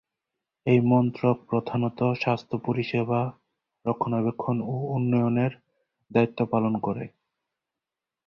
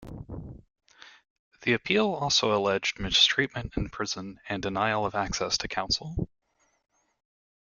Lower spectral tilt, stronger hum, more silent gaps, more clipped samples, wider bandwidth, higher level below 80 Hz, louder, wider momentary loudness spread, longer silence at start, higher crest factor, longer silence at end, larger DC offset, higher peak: first, -9.5 dB/octave vs -3 dB/octave; neither; second, none vs 1.30-1.52 s; neither; second, 6.2 kHz vs 12 kHz; second, -64 dBFS vs -48 dBFS; about the same, -26 LUFS vs -27 LUFS; second, 8 LU vs 16 LU; first, 0.65 s vs 0 s; about the same, 20 dB vs 22 dB; second, 1.2 s vs 1.5 s; neither; about the same, -8 dBFS vs -8 dBFS